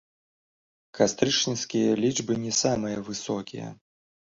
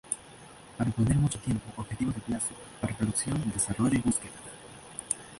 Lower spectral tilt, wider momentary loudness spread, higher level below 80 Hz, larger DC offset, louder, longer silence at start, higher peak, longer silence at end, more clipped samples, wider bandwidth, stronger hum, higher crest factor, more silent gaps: second, -3.5 dB/octave vs -5 dB/octave; second, 10 LU vs 18 LU; second, -62 dBFS vs -50 dBFS; neither; first, -26 LUFS vs -30 LUFS; first, 0.95 s vs 0.05 s; about the same, -6 dBFS vs -8 dBFS; first, 0.5 s vs 0 s; neither; second, 8 kHz vs 11.5 kHz; neither; about the same, 22 dB vs 22 dB; neither